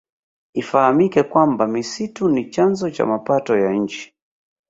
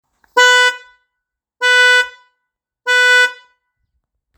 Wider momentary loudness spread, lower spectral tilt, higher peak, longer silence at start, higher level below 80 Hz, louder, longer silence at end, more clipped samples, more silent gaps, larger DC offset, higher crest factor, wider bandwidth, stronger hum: about the same, 11 LU vs 13 LU; first, -6 dB/octave vs 4 dB/octave; about the same, -2 dBFS vs 0 dBFS; first, 0.55 s vs 0.35 s; first, -60 dBFS vs -70 dBFS; second, -18 LUFS vs -11 LUFS; second, 0.65 s vs 1.05 s; neither; neither; neither; about the same, 18 dB vs 16 dB; second, 7.8 kHz vs over 20 kHz; neither